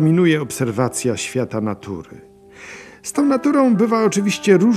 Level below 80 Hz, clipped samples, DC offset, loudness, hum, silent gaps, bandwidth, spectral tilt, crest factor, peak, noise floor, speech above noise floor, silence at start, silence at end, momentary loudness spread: -60 dBFS; under 0.1%; under 0.1%; -18 LUFS; none; none; 14 kHz; -5.5 dB/octave; 16 dB; 0 dBFS; -39 dBFS; 22 dB; 0 s; 0 s; 16 LU